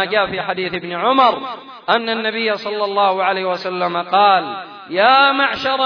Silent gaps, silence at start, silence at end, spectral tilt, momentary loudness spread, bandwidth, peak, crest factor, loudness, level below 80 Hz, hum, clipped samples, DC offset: none; 0 s; 0 s; -5.5 dB/octave; 11 LU; 5.4 kHz; -2 dBFS; 16 dB; -16 LUFS; -58 dBFS; none; under 0.1%; under 0.1%